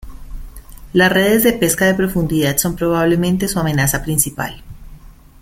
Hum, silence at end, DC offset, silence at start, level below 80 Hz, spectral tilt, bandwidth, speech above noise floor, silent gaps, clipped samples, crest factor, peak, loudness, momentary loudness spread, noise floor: none; 0.3 s; under 0.1%; 0.05 s; -34 dBFS; -4.5 dB/octave; 16.5 kHz; 24 dB; none; under 0.1%; 16 dB; 0 dBFS; -15 LUFS; 6 LU; -39 dBFS